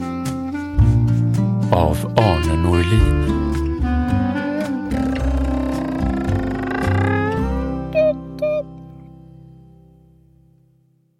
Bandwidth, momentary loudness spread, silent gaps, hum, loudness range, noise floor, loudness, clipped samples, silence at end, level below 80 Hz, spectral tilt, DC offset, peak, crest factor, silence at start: 13.5 kHz; 8 LU; none; none; 7 LU; -58 dBFS; -19 LUFS; under 0.1%; 1.8 s; -26 dBFS; -7.5 dB/octave; under 0.1%; 0 dBFS; 18 dB; 0 s